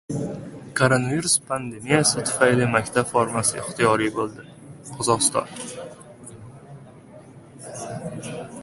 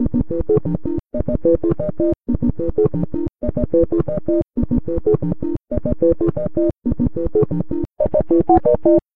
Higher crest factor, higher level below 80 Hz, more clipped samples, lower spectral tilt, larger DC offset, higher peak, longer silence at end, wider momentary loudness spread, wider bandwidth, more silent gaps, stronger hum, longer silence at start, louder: first, 22 dB vs 16 dB; second, -56 dBFS vs -32 dBFS; neither; second, -3.5 dB/octave vs -13 dB/octave; second, under 0.1% vs 5%; about the same, -2 dBFS vs 0 dBFS; about the same, 0 s vs 0 s; first, 23 LU vs 9 LU; first, 12 kHz vs 2.7 kHz; neither; neither; about the same, 0.1 s vs 0 s; second, -22 LUFS vs -19 LUFS